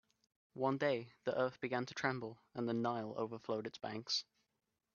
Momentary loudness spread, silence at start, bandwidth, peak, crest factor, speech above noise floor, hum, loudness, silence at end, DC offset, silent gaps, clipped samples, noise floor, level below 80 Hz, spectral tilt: 8 LU; 0.55 s; 7.2 kHz; -20 dBFS; 22 dB; 48 dB; none; -40 LUFS; 0.75 s; under 0.1%; none; under 0.1%; -87 dBFS; -82 dBFS; -5 dB/octave